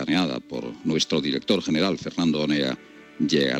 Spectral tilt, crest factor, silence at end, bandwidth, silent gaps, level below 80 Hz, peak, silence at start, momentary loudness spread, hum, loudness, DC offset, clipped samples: -4.5 dB/octave; 16 dB; 0 s; 12 kHz; none; -60 dBFS; -8 dBFS; 0 s; 8 LU; none; -24 LUFS; under 0.1%; under 0.1%